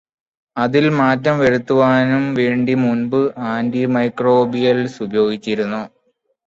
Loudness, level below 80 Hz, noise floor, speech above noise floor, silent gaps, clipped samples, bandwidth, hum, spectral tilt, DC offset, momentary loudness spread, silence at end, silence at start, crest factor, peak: -16 LUFS; -56 dBFS; -64 dBFS; 49 dB; none; under 0.1%; 7.6 kHz; none; -7.5 dB/octave; under 0.1%; 7 LU; 0.6 s; 0.55 s; 14 dB; -2 dBFS